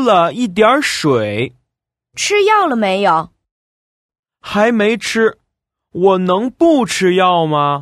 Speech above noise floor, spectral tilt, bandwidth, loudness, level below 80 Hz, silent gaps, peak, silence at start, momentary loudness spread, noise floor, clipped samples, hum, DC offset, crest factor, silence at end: 66 dB; -4.5 dB/octave; 14.5 kHz; -14 LUFS; -54 dBFS; 3.51-4.09 s, 4.19-4.23 s; 0 dBFS; 0 s; 8 LU; -79 dBFS; under 0.1%; none; under 0.1%; 14 dB; 0 s